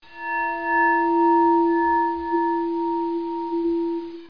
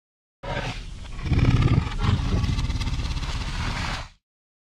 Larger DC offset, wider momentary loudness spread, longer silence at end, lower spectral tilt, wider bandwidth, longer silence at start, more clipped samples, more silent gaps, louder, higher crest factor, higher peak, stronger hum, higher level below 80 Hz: first, 0.3% vs under 0.1%; second, 9 LU vs 14 LU; second, 0 s vs 0.5 s; first, -7.5 dB/octave vs -6 dB/octave; second, 5.2 kHz vs 11 kHz; second, 0.1 s vs 0.45 s; neither; neither; first, -22 LUFS vs -26 LUFS; second, 12 dB vs 18 dB; about the same, -10 dBFS vs -8 dBFS; neither; second, -56 dBFS vs -30 dBFS